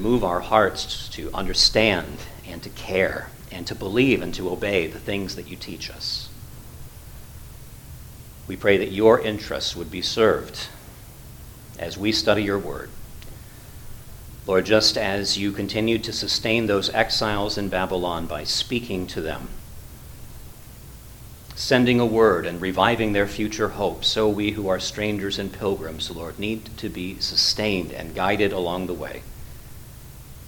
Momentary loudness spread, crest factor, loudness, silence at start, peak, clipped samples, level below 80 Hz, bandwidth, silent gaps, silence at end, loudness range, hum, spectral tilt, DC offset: 24 LU; 24 dB; -23 LUFS; 0 s; -2 dBFS; under 0.1%; -42 dBFS; 19 kHz; none; 0 s; 7 LU; none; -4 dB/octave; under 0.1%